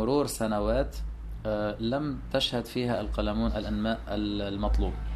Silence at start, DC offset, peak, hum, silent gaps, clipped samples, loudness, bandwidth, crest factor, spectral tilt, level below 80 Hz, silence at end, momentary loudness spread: 0 s; under 0.1%; -12 dBFS; none; none; under 0.1%; -30 LUFS; 13.5 kHz; 16 dB; -5.5 dB/octave; -36 dBFS; 0 s; 5 LU